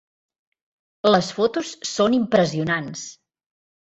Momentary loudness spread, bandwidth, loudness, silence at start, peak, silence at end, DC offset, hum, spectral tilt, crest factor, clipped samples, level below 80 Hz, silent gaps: 13 LU; 8.2 kHz; -21 LUFS; 1.05 s; -4 dBFS; 0.7 s; under 0.1%; none; -4.5 dB/octave; 18 dB; under 0.1%; -60 dBFS; none